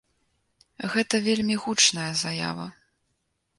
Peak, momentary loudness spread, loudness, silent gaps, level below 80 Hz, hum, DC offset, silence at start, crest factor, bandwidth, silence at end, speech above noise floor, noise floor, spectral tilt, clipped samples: -6 dBFS; 15 LU; -24 LUFS; none; -64 dBFS; none; under 0.1%; 0.8 s; 22 dB; 11.5 kHz; 0.85 s; 50 dB; -75 dBFS; -2.5 dB/octave; under 0.1%